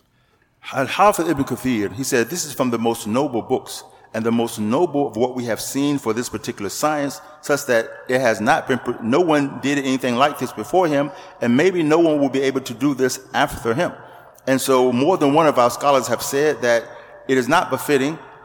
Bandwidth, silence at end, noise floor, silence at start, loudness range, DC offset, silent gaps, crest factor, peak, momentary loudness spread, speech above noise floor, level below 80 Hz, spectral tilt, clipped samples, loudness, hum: 19 kHz; 0 s; -60 dBFS; 0.65 s; 4 LU; under 0.1%; none; 16 dB; -2 dBFS; 9 LU; 41 dB; -54 dBFS; -4.5 dB/octave; under 0.1%; -19 LUFS; none